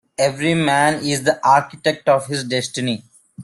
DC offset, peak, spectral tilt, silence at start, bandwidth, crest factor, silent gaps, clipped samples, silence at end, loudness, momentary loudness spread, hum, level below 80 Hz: under 0.1%; -2 dBFS; -4 dB/octave; 0.2 s; 12.5 kHz; 16 dB; none; under 0.1%; 0 s; -18 LUFS; 7 LU; none; -58 dBFS